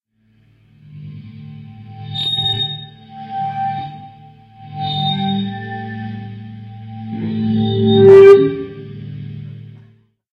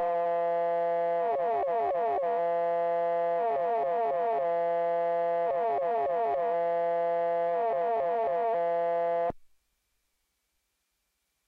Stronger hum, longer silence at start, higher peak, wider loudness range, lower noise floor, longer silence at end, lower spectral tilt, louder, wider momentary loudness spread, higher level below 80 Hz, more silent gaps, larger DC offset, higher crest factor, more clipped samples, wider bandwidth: neither; first, 0.9 s vs 0 s; first, 0 dBFS vs -22 dBFS; first, 11 LU vs 2 LU; second, -56 dBFS vs -79 dBFS; second, 0.7 s vs 2.05 s; about the same, -7.5 dB/octave vs -7 dB/octave; first, -14 LUFS vs -29 LUFS; first, 27 LU vs 0 LU; first, -52 dBFS vs -70 dBFS; neither; neither; first, 16 dB vs 8 dB; neither; about the same, 5.2 kHz vs 4.9 kHz